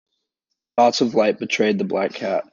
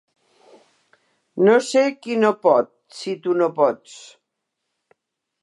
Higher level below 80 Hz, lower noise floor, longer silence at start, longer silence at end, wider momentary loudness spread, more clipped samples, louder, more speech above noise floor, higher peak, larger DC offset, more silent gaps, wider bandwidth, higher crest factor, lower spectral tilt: first, -70 dBFS vs -80 dBFS; about the same, -80 dBFS vs -79 dBFS; second, 0.75 s vs 1.35 s; second, 0.1 s vs 1.45 s; second, 7 LU vs 18 LU; neither; about the same, -20 LUFS vs -19 LUFS; about the same, 61 dB vs 60 dB; about the same, -4 dBFS vs -4 dBFS; neither; neither; second, 7.4 kHz vs 11.5 kHz; about the same, 18 dB vs 18 dB; about the same, -4.5 dB/octave vs -5 dB/octave